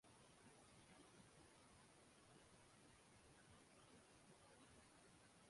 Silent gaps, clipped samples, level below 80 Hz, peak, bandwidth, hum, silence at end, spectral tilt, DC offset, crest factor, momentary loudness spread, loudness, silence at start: none; under 0.1%; -84 dBFS; -56 dBFS; 11.5 kHz; none; 0 s; -3.5 dB/octave; under 0.1%; 14 dB; 2 LU; -69 LUFS; 0.05 s